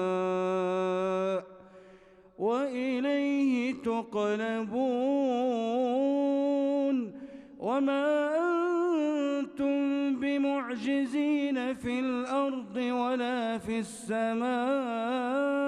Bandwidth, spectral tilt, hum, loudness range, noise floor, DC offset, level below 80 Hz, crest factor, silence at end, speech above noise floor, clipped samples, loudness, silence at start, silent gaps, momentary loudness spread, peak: 11 kHz; -6 dB/octave; none; 2 LU; -56 dBFS; under 0.1%; -70 dBFS; 10 dB; 0 s; 26 dB; under 0.1%; -30 LUFS; 0 s; none; 5 LU; -18 dBFS